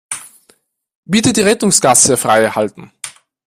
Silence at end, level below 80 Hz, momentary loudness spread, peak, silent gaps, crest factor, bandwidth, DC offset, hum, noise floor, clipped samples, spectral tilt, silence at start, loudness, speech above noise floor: 0.35 s; -52 dBFS; 21 LU; 0 dBFS; 0.95-1.03 s; 14 dB; over 20 kHz; under 0.1%; none; -55 dBFS; under 0.1%; -3 dB/octave; 0.1 s; -11 LUFS; 43 dB